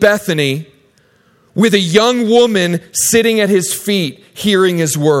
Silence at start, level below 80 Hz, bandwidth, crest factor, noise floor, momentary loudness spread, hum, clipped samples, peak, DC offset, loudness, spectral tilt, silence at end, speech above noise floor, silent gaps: 0 s; -52 dBFS; 16.5 kHz; 14 dB; -52 dBFS; 7 LU; none; under 0.1%; 0 dBFS; under 0.1%; -13 LUFS; -4 dB/octave; 0 s; 40 dB; none